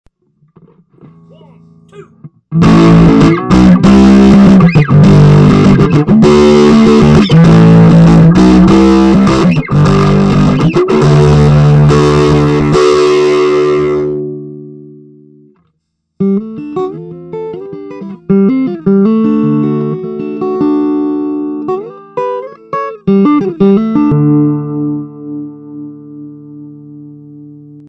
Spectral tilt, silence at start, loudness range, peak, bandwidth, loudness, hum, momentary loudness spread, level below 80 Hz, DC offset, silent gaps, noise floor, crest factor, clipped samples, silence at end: -8 dB/octave; 2 s; 12 LU; 0 dBFS; 9.2 kHz; -7 LUFS; none; 18 LU; -26 dBFS; under 0.1%; none; -65 dBFS; 8 dB; 0.9%; 0.45 s